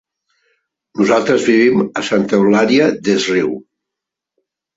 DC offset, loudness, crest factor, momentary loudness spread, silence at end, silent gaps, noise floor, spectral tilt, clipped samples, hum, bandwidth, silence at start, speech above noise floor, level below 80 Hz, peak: under 0.1%; -14 LUFS; 14 dB; 7 LU; 1.15 s; none; -82 dBFS; -5 dB/octave; under 0.1%; none; 8 kHz; 0.95 s; 69 dB; -56 dBFS; -2 dBFS